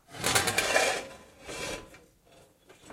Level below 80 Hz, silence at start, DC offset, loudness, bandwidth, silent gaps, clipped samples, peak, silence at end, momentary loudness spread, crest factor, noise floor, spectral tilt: -58 dBFS; 0.1 s; under 0.1%; -28 LUFS; 16 kHz; none; under 0.1%; -8 dBFS; 0 s; 19 LU; 24 dB; -59 dBFS; -1.5 dB/octave